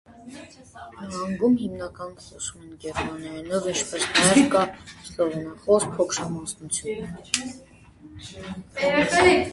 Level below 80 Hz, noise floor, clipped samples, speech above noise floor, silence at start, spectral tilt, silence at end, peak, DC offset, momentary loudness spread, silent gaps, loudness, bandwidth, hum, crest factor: -52 dBFS; -47 dBFS; under 0.1%; 22 dB; 0.1 s; -3.5 dB/octave; 0 s; -2 dBFS; under 0.1%; 24 LU; none; -24 LUFS; 11.5 kHz; none; 22 dB